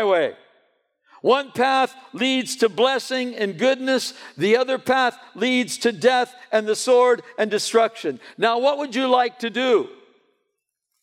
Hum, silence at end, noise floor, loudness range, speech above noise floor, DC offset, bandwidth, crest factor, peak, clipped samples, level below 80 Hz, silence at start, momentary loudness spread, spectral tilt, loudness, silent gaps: none; 1.1 s; -78 dBFS; 2 LU; 58 dB; under 0.1%; 15.5 kHz; 16 dB; -4 dBFS; under 0.1%; -78 dBFS; 0 s; 7 LU; -3 dB/octave; -21 LUFS; none